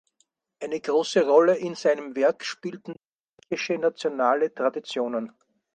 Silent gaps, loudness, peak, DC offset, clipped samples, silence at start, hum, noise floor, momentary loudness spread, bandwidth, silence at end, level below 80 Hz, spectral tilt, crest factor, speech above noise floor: 3.12-3.37 s; -24 LUFS; -6 dBFS; under 0.1%; under 0.1%; 0.6 s; none; -71 dBFS; 17 LU; 9.2 kHz; 0.45 s; -76 dBFS; -4.5 dB/octave; 20 dB; 47 dB